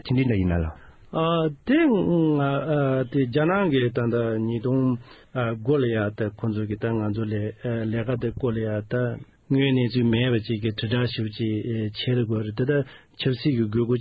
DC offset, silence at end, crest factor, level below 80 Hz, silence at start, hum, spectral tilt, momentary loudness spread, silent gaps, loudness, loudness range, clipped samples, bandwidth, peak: under 0.1%; 0 s; 14 dB; -44 dBFS; 0.05 s; none; -10.5 dB/octave; 7 LU; none; -24 LUFS; 4 LU; under 0.1%; 5.2 kHz; -8 dBFS